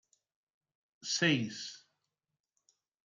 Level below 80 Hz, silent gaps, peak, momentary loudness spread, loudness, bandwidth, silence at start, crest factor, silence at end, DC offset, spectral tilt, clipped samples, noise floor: -80 dBFS; none; -16 dBFS; 16 LU; -32 LUFS; 9.6 kHz; 1 s; 24 dB; 1.3 s; under 0.1%; -3.5 dB/octave; under 0.1%; -89 dBFS